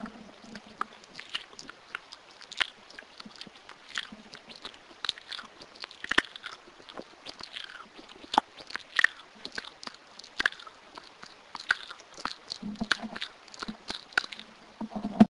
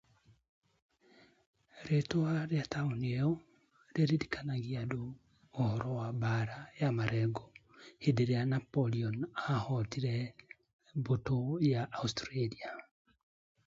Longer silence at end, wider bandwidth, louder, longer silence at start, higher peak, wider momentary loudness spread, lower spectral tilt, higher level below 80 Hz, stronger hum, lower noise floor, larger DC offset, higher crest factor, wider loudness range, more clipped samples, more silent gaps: second, 0.1 s vs 0.85 s; first, 11.5 kHz vs 7.6 kHz; about the same, -34 LUFS vs -35 LUFS; second, 0 s vs 1.75 s; first, -4 dBFS vs -16 dBFS; first, 20 LU vs 11 LU; second, -3.5 dB/octave vs -7 dB/octave; about the same, -64 dBFS vs -64 dBFS; neither; second, -51 dBFS vs -65 dBFS; neither; first, 32 dB vs 20 dB; first, 7 LU vs 2 LU; neither; second, none vs 10.73-10.79 s